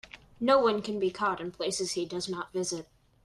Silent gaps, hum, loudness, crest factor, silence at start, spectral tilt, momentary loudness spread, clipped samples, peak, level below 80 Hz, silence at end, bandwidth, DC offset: none; none; -30 LUFS; 20 dB; 0.15 s; -3.5 dB/octave; 10 LU; under 0.1%; -10 dBFS; -64 dBFS; 0.4 s; 13 kHz; under 0.1%